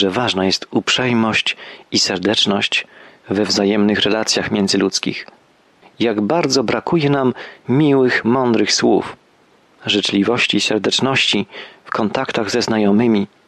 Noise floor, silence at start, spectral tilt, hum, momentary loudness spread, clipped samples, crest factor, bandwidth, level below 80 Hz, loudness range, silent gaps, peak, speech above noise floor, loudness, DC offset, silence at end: -53 dBFS; 0 s; -4 dB/octave; none; 7 LU; under 0.1%; 14 dB; 12.5 kHz; -56 dBFS; 2 LU; none; -4 dBFS; 37 dB; -16 LUFS; under 0.1%; 0.2 s